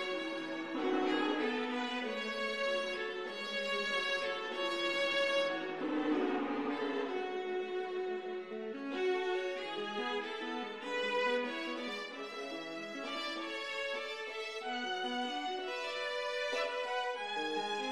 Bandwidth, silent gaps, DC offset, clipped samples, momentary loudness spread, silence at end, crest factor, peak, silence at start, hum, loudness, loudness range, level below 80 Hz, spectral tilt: 13 kHz; none; under 0.1%; under 0.1%; 7 LU; 0 s; 16 dB; -22 dBFS; 0 s; none; -36 LUFS; 4 LU; -78 dBFS; -3 dB/octave